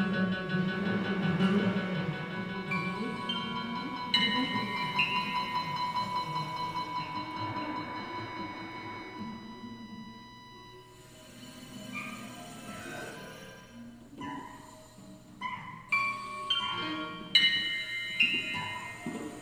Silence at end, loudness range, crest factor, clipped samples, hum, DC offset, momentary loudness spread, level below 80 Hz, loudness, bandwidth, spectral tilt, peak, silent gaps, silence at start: 0 s; 15 LU; 26 dB; under 0.1%; none; under 0.1%; 22 LU; -64 dBFS; -32 LUFS; 15.5 kHz; -4.5 dB/octave; -8 dBFS; none; 0 s